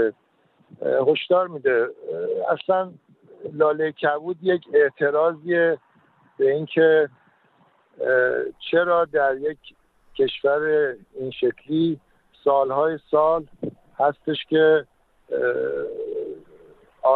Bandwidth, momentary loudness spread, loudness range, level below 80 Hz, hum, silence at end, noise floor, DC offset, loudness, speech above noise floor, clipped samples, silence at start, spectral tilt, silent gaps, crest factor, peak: 4.3 kHz; 12 LU; 2 LU; -64 dBFS; none; 0 s; -62 dBFS; under 0.1%; -22 LUFS; 41 dB; under 0.1%; 0 s; -8.5 dB/octave; none; 16 dB; -6 dBFS